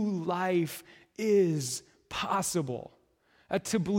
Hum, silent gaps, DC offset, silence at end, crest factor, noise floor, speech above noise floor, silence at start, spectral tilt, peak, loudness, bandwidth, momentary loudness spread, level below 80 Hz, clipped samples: none; none; under 0.1%; 0 s; 16 dB; -67 dBFS; 38 dB; 0 s; -5 dB/octave; -16 dBFS; -31 LUFS; 16.5 kHz; 14 LU; -66 dBFS; under 0.1%